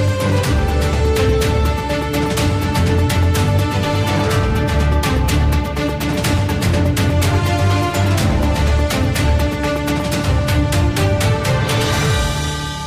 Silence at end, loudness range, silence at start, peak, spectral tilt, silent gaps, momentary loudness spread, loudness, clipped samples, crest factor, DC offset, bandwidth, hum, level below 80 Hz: 0 s; 1 LU; 0 s; -4 dBFS; -5.5 dB/octave; none; 3 LU; -17 LUFS; under 0.1%; 12 dB; under 0.1%; 15.5 kHz; none; -22 dBFS